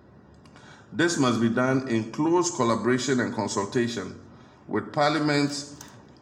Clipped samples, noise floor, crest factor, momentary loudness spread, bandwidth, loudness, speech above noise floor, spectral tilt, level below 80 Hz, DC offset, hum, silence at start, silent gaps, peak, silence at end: under 0.1%; -51 dBFS; 16 dB; 14 LU; 15.5 kHz; -25 LUFS; 27 dB; -4.5 dB/octave; -64 dBFS; under 0.1%; none; 0.55 s; none; -10 dBFS; 0.2 s